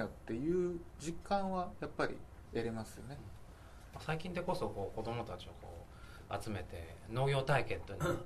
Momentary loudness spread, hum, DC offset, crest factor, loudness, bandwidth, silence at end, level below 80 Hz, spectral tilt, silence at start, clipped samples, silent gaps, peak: 18 LU; none; under 0.1%; 20 dB; -40 LUFS; 13.5 kHz; 0 s; -56 dBFS; -6 dB/octave; 0 s; under 0.1%; none; -20 dBFS